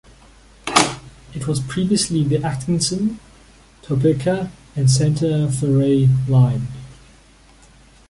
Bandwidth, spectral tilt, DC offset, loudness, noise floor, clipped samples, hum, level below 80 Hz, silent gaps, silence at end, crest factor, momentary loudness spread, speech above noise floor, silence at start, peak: 11.5 kHz; -5.5 dB/octave; under 0.1%; -18 LUFS; -49 dBFS; under 0.1%; none; -44 dBFS; none; 1.15 s; 20 dB; 13 LU; 31 dB; 0.65 s; 0 dBFS